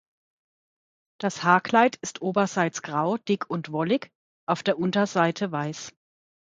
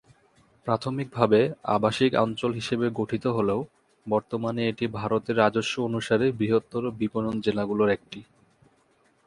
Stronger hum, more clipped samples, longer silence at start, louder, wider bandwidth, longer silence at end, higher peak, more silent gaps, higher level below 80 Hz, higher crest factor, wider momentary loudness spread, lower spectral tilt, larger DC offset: neither; neither; first, 1.2 s vs 0.65 s; about the same, -25 LUFS vs -26 LUFS; second, 9.4 kHz vs 11.5 kHz; second, 0.6 s vs 1.05 s; about the same, -4 dBFS vs -4 dBFS; first, 4.15-4.47 s vs none; second, -72 dBFS vs -60 dBFS; about the same, 22 dB vs 22 dB; about the same, 10 LU vs 8 LU; second, -5 dB/octave vs -6.5 dB/octave; neither